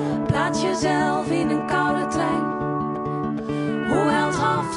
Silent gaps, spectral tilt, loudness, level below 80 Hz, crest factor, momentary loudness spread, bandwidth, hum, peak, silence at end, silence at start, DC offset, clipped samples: none; -5.5 dB/octave; -22 LUFS; -50 dBFS; 14 dB; 6 LU; 11.5 kHz; none; -8 dBFS; 0 s; 0 s; under 0.1%; under 0.1%